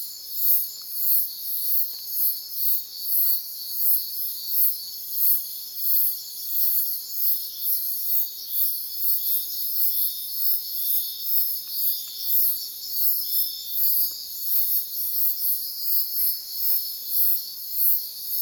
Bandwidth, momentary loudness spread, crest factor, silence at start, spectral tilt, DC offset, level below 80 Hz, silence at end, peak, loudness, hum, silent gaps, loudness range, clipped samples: over 20 kHz; 6 LU; 20 dB; 0 s; 3 dB/octave; under 0.1%; -76 dBFS; 0 s; -6 dBFS; -21 LUFS; none; none; 1 LU; under 0.1%